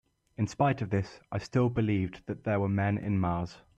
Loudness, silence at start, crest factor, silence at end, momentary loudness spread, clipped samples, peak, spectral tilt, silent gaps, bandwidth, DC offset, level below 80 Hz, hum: -31 LUFS; 0.4 s; 14 dB; 0.2 s; 9 LU; under 0.1%; -16 dBFS; -8 dB/octave; none; 8.2 kHz; under 0.1%; -56 dBFS; none